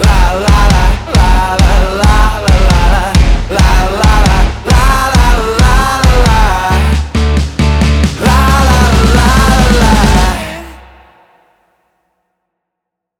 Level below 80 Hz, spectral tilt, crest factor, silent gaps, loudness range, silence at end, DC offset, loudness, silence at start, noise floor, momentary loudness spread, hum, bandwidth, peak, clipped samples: -10 dBFS; -5 dB/octave; 8 dB; none; 3 LU; 2.4 s; under 0.1%; -9 LUFS; 0 s; -77 dBFS; 4 LU; none; 16.5 kHz; 0 dBFS; under 0.1%